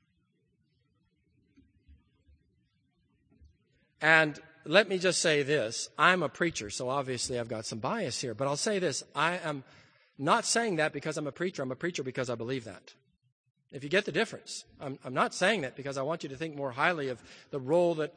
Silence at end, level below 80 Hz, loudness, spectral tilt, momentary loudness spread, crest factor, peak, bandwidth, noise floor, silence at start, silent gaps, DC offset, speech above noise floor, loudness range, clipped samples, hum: 0.05 s; -70 dBFS; -30 LUFS; -3.5 dB/octave; 13 LU; 26 dB; -6 dBFS; 10 kHz; -74 dBFS; 1.9 s; 13.32-13.44 s; under 0.1%; 44 dB; 8 LU; under 0.1%; none